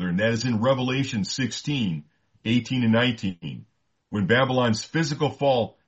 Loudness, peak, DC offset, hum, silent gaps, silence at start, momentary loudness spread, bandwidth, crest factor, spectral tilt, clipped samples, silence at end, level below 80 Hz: -24 LUFS; -6 dBFS; under 0.1%; none; none; 0 s; 12 LU; 8.2 kHz; 18 dB; -5.5 dB/octave; under 0.1%; 0.2 s; -60 dBFS